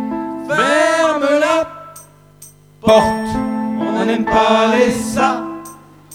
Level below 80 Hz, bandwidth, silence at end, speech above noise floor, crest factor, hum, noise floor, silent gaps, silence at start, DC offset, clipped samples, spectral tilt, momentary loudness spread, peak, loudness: -44 dBFS; 17 kHz; 0 s; 29 dB; 16 dB; 50 Hz at -45 dBFS; -43 dBFS; none; 0 s; under 0.1%; under 0.1%; -4.5 dB/octave; 12 LU; 0 dBFS; -15 LUFS